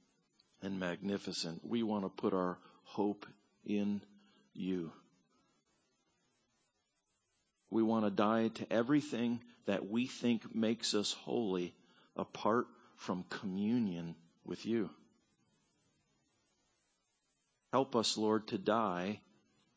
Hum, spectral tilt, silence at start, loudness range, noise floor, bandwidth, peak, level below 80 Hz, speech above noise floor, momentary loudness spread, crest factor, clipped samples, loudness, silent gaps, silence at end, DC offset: none; -5 dB/octave; 0.6 s; 11 LU; -82 dBFS; 8 kHz; -18 dBFS; -76 dBFS; 46 dB; 15 LU; 20 dB; under 0.1%; -37 LUFS; none; 0.6 s; under 0.1%